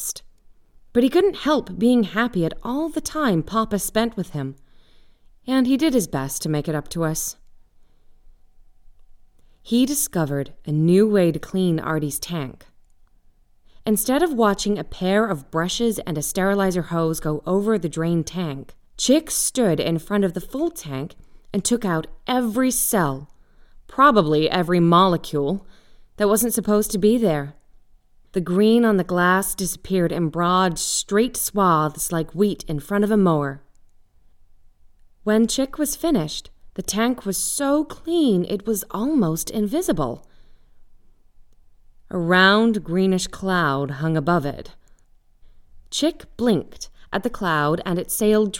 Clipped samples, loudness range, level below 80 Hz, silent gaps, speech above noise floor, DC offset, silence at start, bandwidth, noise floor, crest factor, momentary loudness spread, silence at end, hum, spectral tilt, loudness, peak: under 0.1%; 5 LU; -46 dBFS; none; 34 dB; under 0.1%; 0 s; 19.5 kHz; -54 dBFS; 20 dB; 11 LU; 0 s; none; -4.5 dB/octave; -21 LUFS; -2 dBFS